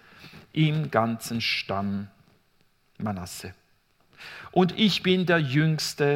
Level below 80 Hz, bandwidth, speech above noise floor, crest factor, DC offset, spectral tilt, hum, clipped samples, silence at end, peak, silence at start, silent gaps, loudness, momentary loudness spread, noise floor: -64 dBFS; 16.5 kHz; 40 dB; 20 dB; under 0.1%; -5.5 dB/octave; none; under 0.1%; 0 s; -6 dBFS; 0.2 s; none; -25 LUFS; 19 LU; -65 dBFS